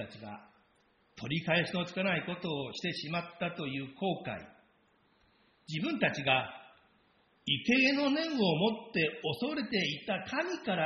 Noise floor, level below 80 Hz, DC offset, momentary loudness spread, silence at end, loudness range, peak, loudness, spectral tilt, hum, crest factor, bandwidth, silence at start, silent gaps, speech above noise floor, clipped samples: -70 dBFS; -70 dBFS; under 0.1%; 14 LU; 0 s; 7 LU; -14 dBFS; -32 LUFS; -3 dB/octave; none; 20 dB; 6.6 kHz; 0 s; none; 37 dB; under 0.1%